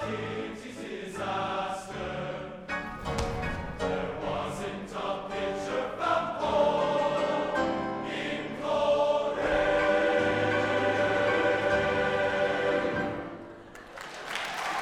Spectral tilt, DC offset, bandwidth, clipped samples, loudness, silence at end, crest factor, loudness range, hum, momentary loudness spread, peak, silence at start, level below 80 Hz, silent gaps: -5 dB/octave; under 0.1%; 13 kHz; under 0.1%; -29 LUFS; 0 s; 18 dB; 8 LU; none; 12 LU; -12 dBFS; 0 s; -50 dBFS; none